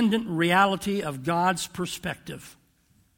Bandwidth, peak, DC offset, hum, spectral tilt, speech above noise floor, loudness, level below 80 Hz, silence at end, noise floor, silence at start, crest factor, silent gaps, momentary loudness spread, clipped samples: 18.5 kHz; -6 dBFS; under 0.1%; none; -4.5 dB/octave; 38 dB; -25 LUFS; -58 dBFS; 0.65 s; -64 dBFS; 0 s; 20 dB; none; 16 LU; under 0.1%